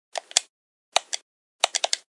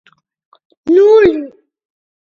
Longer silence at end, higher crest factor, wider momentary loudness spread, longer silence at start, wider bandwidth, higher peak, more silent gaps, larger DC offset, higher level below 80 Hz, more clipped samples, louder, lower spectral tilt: second, 0.2 s vs 0.85 s; first, 28 dB vs 14 dB; second, 7 LU vs 19 LU; second, 0.15 s vs 0.85 s; first, 11.5 kHz vs 7 kHz; about the same, 0 dBFS vs 0 dBFS; first, 0.49-0.92 s, 1.22-1.59 s vs none; neither; second, -72 dBFS vs -50 dBFS; neither; second, -25 LUFS vs -9 LUFS; second, 3 dB/octave vs -6.5 dB/octave